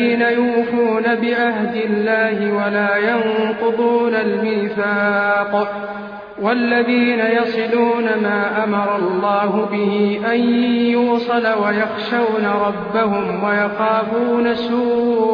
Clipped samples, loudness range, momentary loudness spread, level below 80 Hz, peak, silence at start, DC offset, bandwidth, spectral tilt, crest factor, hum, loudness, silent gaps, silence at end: under 0.1%; 1 LU; 4 LU; -58 dBFS; -4 dBFS; 0 s; under 0.1%; 5.2 kHz; -8 dB/octave; 12 dB; none; -17 LUFS; none; 0 s